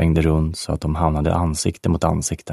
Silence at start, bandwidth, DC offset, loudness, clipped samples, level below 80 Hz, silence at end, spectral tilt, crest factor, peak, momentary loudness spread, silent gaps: 0 s; 13 kHz; under 0.1%; -20 LUFS; under 0.1%; -28 dBFS; 0 s; -6 dB/octave; 16 dB; -2 dBFS; 6 LU; none